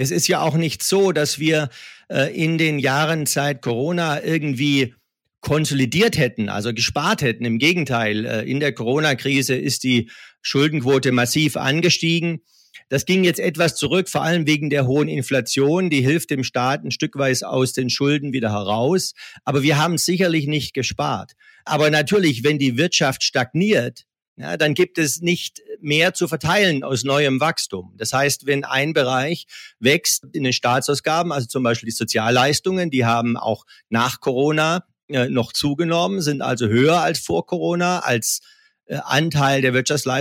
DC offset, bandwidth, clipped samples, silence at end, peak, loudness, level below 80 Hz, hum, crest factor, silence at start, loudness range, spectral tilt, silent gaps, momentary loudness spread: under 0.1%; 16.5 kHz; under 0.1%; 0 s; -2 dBFS; -19 LUFS; -56 dBFS; none; 18 dB; 0 s; 2 LU; -4.5 dB/octave; 24.28-24.36 s, 35.03-35.08 s; 7 LU